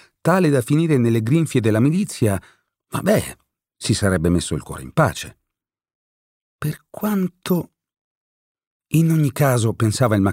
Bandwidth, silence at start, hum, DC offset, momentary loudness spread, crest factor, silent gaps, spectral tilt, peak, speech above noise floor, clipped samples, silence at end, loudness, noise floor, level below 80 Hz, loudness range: 16 kHz; 0.25 s; none; under 0.1%; 11 LU; 16 dB; 5.95-6.59 s, 8.01-8.55 s, 8.67-8.80 s; -6.5 dB/octave; -4 dBFS; 65 dB; under 0.1%; 0 s; -20 LUFS; -83 dBFS; -46 dBFS; 8 LU